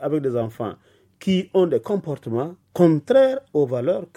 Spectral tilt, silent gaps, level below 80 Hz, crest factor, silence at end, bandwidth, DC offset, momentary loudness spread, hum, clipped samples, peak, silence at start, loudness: -8 dB/octave; none; -64 dBFS; 18 dB; 0.1 s; 13 kHz; under 0.1%; 12 LU; none; under 0.1%; -2 dBFS; 0 s; -21 LUFS